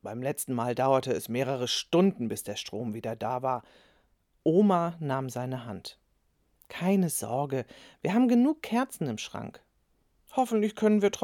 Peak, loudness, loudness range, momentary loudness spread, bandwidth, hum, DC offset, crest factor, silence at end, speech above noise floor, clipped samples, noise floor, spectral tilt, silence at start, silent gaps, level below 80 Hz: -10 dBFS; -29 LUFS; 2 LU; 12 LU; 18 kHz; none; under 0.1%; 18 dB; 0 s; 43 dB; under 0.1%; -71 dBFS; -5.5 dB/octave; 0.05 s; none; -70 dBFS